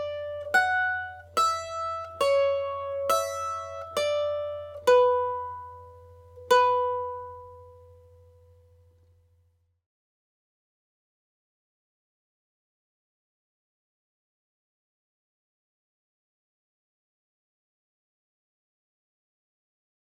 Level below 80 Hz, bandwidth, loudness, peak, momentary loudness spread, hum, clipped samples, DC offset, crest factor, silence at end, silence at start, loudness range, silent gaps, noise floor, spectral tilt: -70 dBFS; 16 kHz; -26 LUFS; -8 dBFS; 15 LU; none; under 0.1%; under 0.1%; 22 dB; 12.25 s; 0 s; 4 LU; none; -68 dBFS; -2 dB/octave